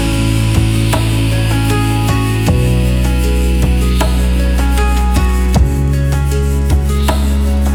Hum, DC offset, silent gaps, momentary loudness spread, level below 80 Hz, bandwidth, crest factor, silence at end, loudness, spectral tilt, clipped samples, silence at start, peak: none; under 0.1%; none; 1 LU; -14 dBFS; 17.5 kHz; 10 dB; 0 s; -14 LUFS; -6 dB/octave; under 0.1%; 0 s; 0 dBFS